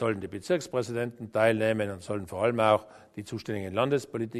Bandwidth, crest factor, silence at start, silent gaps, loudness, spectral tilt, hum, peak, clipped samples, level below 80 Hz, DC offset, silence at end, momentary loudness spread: 13.5 kHz; 20 dB; 0 s; none; -29 LUFS; -6 dB/octave; none; -8 dBFS; under 0.1%; -64 dBFS; under 0.1%; 0 s; 11 LU